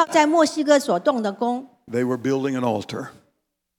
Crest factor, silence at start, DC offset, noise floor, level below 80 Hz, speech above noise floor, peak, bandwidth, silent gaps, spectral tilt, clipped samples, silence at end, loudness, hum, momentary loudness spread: 18 dB; 0 s; under 0.1%; -73 dBFS; -72 dBFS; 52 dB; -2 dBFS; 18.5 kHz; none; -5 dB/octave; under 0.1%; 0.65 s; -21 LUFS; none; 13 LU